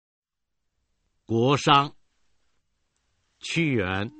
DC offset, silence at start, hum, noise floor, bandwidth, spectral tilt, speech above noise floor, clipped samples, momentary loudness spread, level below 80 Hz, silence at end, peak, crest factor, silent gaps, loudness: under 0.1%; 1.3 s; none; -81 dBFS; 8.4 kHz; -5 dB/octave; 58 dB; under 0.1%; 12 LU; -62 dBFS; 0.1 s; -4 dBFS; 24 dB; none; -23 LUFS